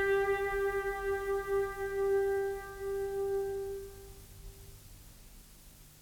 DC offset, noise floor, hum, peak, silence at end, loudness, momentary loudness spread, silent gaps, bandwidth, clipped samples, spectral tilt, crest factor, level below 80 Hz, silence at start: under 0.1%; -55 dBFS; none; -20 dBFS; 0 s; -34 LUFS; 24 LU; none; 19.5 kHz; under 0.1%; -5 dB/octave; 14 dB; -52 dBFS; 0 s